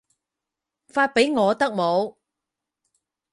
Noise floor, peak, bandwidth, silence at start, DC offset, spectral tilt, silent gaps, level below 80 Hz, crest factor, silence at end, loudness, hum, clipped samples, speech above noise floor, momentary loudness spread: -86 dBFS; -6 dBFS; 11.5 kHz; 0.95 s; under 0.1%; -4.5 dB/octave; none; -70 dBFS; 20 dB; 1.2 s; -21 LUFS; none; under 0.1%; 65 dB; 8 LU